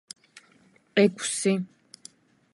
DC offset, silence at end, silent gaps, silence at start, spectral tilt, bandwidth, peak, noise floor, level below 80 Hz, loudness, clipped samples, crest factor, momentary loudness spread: under 0.1%; 0.85 s; none; 0.95 s; -4.5 dB/octave; 11.5 kHz; -8 dBFS; -61 dBFS; -78 dBFS; -25 LUFS; under 0.1%; 20 dB; 25 LU